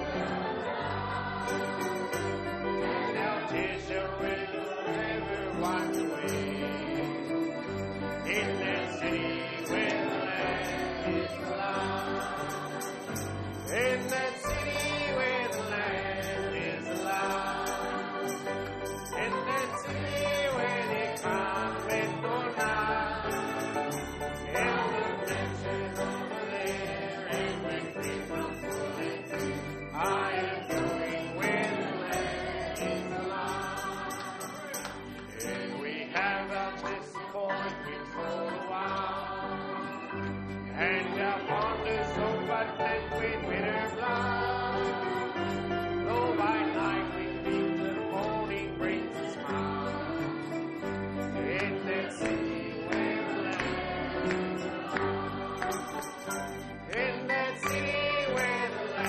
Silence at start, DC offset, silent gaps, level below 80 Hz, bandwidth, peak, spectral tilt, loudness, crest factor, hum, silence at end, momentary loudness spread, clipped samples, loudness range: 0 s; under 0.1%; none; -54 dBFS; 13.5 kHz; -14 dBFS; -4.5 dB/octave; -32 LUFS; 18 dB; none; 0 s; 7 LU; under 0.1%; 3 LU